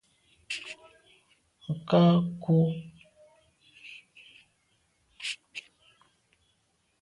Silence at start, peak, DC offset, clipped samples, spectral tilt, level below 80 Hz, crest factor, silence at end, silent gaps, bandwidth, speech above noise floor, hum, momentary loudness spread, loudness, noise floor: 0.5 s; -12 dBFS; under 0.1%; under 0.1%; -7 dB/octave; -68 dBFS; 20 dB; 1.4 s; none; 11 kHz; 49 dB; none; 25 LU; -28 LUFS; -73 dBFS